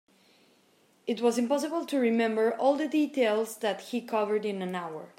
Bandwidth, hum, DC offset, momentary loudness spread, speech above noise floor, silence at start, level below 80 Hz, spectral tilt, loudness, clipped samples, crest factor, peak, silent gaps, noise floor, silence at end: 16 kHz; none; under 0.1%; 9 LU; 37 dB; 1.05 s; -86 dBFS; -5 dB/octave; -28 LUFS; under 0.1%; 16 dB; -12 dBFS; none; -65 dBFS; 0.1 s